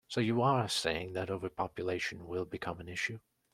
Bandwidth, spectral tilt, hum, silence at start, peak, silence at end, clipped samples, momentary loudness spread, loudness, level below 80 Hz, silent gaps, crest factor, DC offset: 14.5 kHz; -5 dB/octave; none; 0.1 s; -16 dBFS; 0.35 s; under 0.1%; 10 LU; -35 LUFS; -64 dBFS; none; 20 dB; under 0.1%